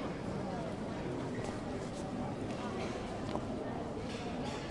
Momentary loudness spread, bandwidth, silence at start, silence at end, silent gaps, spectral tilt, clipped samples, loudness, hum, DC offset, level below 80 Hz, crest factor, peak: 1 LU; 11.5 kHz; 0 s; 0 s; none; -6 dB/octave; under 0.1%; -40 LUFS; none; under 0.1%; -54 dBFS; 20 dB; -20 dBFS